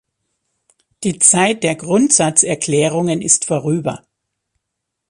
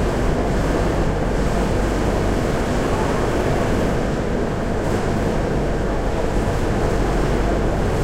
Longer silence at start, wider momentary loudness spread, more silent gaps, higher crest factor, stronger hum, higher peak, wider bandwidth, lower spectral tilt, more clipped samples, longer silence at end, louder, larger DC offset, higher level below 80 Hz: first, 1 s vs 0 s; first, 12 LU vs 2 LU; neither; first, 18 dB vs 12 dB; neither; first, 0 dBFS vs -6 dBFS; second, 13 kHz vs 15.5 kHz; second, -3.5 dB/octave vs -6.5 dB/octave; neither; first, 1.15 s vs 0 s; first, -14 LUFS vs -21 LUFS; second, under 0.1% vs 0.7%; second, -58 dBFS vs -24 dBFS